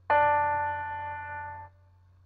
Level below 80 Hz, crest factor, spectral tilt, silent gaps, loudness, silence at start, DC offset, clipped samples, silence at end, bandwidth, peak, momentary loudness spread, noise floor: -64 dBFS; 18 dB; -8 dB/octave; none; -29 LUFS; 0.1 s; under 0.1%; under 0.1%; 0.6 s; 4.5 kHz; -12 dBFS; 17 LU; -59 dBFS